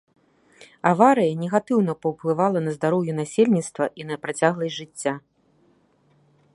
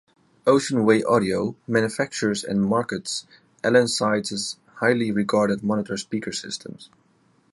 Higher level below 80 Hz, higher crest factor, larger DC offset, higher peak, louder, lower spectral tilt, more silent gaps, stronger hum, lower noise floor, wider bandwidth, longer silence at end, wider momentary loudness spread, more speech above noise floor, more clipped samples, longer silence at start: second, -68 dBFS vs -60 dBFS; about the same, 22 dB vs 18 dB; neither; about the same, -2 dBFS vs -4 dBFS; about the same, -22 LUFS vs -23 LUFS; first, -6 dB/octave vs -4.5 dB/octave; neither; neither; about the same, -61 dBFS vs -62 dBFS; about the same, 11.5 kHz vs 11.5 kHz; first, 1.35 s vs 0.65 s; about the same, 11 LU vs 11 LU; about the same, 39 dB vs 39 dB; neither; first, 0.85 s vs 0.45 s